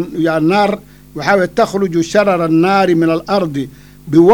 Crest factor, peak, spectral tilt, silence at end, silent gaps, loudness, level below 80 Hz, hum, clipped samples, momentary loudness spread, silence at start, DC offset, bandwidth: 12 dB; 0 dBFS; -6.5 dB/octave; 0 s; none; -13 LUFS; -46 dBFS; none; under 0.1%; 10 LU; 0 s; under 0.1%; 16 kHz